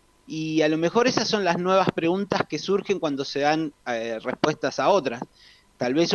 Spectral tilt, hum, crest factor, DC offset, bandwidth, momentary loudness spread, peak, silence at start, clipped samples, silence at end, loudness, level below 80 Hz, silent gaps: -5 dB/octave; none; 18 dB; under 0.1%; 9 kHz; 9 LU; -6 dBFS; 0.3 s; under 0.1%; 0 s; -24 LUFS; -62 dBFS; none